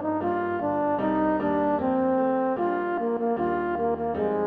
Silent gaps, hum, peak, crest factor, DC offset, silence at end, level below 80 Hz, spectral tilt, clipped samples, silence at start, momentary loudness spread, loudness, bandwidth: none; none; -12 dBFS; 12 dB; under 0.1%; 0 s; -54 dBFS; -10 dB/octave; under 0.1%; 0 s; 3 LU; -25 LUFS; 4.8 kHz